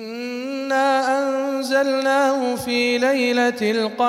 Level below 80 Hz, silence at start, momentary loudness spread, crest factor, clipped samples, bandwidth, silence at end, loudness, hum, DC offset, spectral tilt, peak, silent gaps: -66 dBFS; 0 s; 7 LU; 14 dB; under 0.1%; 16 kHz; 0 s; -20 LUFS; none; under 0.1%; -3.5 dB/octave; -6 dBFS; none